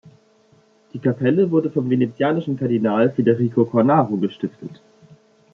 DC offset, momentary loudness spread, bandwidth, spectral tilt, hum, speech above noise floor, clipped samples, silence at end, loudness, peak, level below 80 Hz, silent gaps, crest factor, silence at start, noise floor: under 0.1%; 13 LU; 6.4 kHz; -10 dB/octave; none; 37 dB; under 0.1%; 0.8 s; -19 LUFS; -2 dBFS; -66 dBFS; none; 18 dB; 0.05 s; -56 dBFS